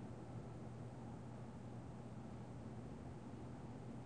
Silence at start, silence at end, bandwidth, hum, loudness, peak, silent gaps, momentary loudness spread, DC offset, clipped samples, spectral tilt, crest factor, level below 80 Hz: 0 s; 0 s; 9.6 kHz; none; -53 LUFS; -40 dBFS; none; 1 LU; under 0.1%; under 0.1%; -8 dB/octave; 12 dB; -66 dBFS